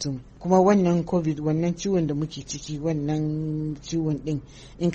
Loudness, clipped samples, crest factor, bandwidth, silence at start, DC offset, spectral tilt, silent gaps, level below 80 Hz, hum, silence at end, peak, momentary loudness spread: -25 LUFS; under 0.1%; 18 dB; 8.4 kHz; 0 s; under 0.1%; -7 dB/octave; none; -48 dBFS; none; 0 s; -6 dBFS; 12 LU